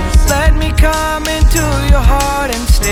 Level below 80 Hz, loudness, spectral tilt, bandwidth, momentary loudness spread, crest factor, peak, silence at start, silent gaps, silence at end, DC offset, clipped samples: -12 dBFS; -13 LUFS; -4.5 dB/octave; 16.5 kHz; 4 LU; 10 dB; 0 dBFS; 0 s; none; 0 s; under 0.1%; under 0.1%